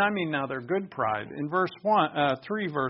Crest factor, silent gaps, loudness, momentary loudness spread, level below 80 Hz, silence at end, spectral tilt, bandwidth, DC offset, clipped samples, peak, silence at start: 16 dB; none; -28 LUFS; 6 LU; -68 dBFS; 0 s; -3.5 dB/octave; 5.8 kHz; under 0.1%; under 0.1%; -10 dBFS; 0 s